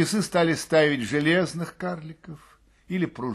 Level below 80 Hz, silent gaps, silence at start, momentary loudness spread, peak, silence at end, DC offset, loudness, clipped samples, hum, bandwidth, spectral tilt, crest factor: -60 dBFS; none; 0 s; 18 LU; -6 dBFS; 0 s; under 0.1%; -24 LUFS; under 0.1%; none; 12.5 kHz; -5 dB/octave; 18 dB